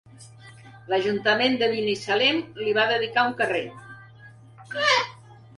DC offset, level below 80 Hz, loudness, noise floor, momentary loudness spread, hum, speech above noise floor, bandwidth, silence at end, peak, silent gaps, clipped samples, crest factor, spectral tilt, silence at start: under 0.1%; -66 dBFS; -23 LUFS; -48 dBFS; 9 LU; none; 25 dB; 11.5 kHz; 0.25 s; -8 dBFS; none; under 0.1%; 18 dB; -3.5 dB/octave; 0.2 s